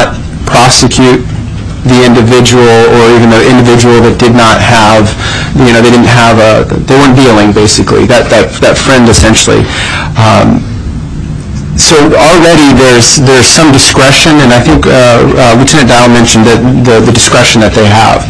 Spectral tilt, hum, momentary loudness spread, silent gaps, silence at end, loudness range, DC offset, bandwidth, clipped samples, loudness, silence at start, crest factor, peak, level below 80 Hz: -4.5 dB/octave; none; 8 LU; none; 0 s; 3 LU; under 0.1%; 11 kHz; 8%; -3 LUFS; 0 s; 4 dB; 0 dBFS; -20 dBFS